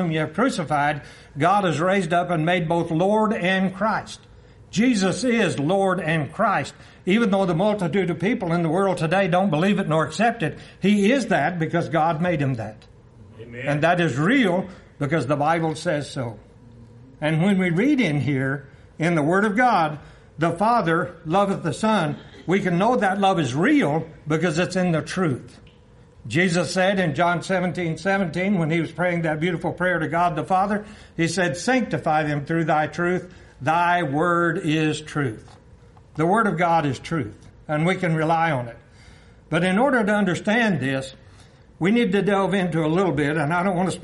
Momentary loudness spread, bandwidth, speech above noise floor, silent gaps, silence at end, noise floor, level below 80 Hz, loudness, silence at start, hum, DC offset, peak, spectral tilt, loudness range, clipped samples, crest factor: 8 LU; 11.5 kHz; 29 dB; none; 0 s; -50 dBFS; -54 dBFS; -22 LUFS; 0 s; none; under 0.1%; -6 dBFS; -6 dB/octave; 2 LU; under 0.1%; 16 dB